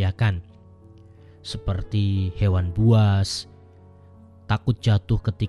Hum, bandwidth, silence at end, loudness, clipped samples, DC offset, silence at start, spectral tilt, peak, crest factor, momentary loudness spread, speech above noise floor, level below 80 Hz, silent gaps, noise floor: none; 11 kHz; 0 s; -23 LUFS; under 0.1%; under 0.1%; 0 s; -6.5 dB/octave; -6 dBFS; 16 dB; 14 LU; 27 dB; -40 dBFS; none; -48 dBFS